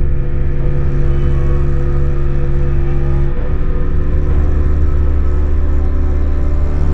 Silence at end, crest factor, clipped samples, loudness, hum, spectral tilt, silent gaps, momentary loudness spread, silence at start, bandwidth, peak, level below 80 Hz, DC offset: 0 s; 10 dB; under 0.1%; -17 LUFS; none; -10 dB/octave; none; 3 LU; 0 s; 3.2 kHz; -2 dBFS; -12 dBFS; under 0.1%